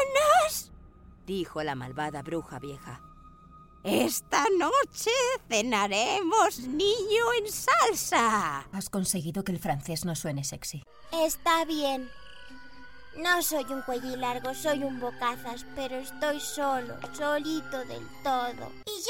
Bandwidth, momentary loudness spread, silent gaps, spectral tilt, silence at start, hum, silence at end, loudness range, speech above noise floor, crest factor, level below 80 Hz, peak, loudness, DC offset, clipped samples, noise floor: 17 kHz; 15 LU; none; -3 dB/octave; 0 s; none; 0 s; 7 LU; 23 dB; 20 dB; -56 dBFS; -10 dBFS; -28 LUFS; under 0.1%; under 0.1%; -53 dBFS